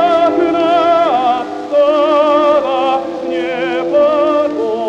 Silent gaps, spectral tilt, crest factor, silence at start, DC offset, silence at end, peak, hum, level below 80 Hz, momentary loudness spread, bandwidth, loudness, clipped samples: none; -5 dB/octave; 10 dB; 0 s; under 0.1%; 0 s; -2 dBFS; none; -54 dBFS; 7 LU; 8.4 kHz; -13 LUFS; under 0.1%